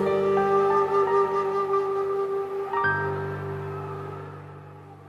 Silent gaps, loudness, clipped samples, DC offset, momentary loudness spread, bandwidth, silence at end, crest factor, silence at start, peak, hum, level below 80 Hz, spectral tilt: none; -25 LUFS; under 0.1%; under 0.1%; 18 LU; 7.2 kHz; 0 s; 14 dB; 0 s; -12 dBFS; none; -64 dBFS; -7.5 dB/octave